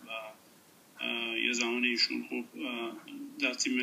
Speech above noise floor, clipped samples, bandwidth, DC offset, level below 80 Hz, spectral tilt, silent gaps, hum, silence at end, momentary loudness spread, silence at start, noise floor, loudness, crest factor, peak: 26 dB; under 0.1%; 15.5 kHz; under 0.1%; -88 dBFS; -1 dB/octave; none; none; 0 s; 14 LU; 0 s; -60 dBFS; -32 LUFS; 20 dB; -14 dBFS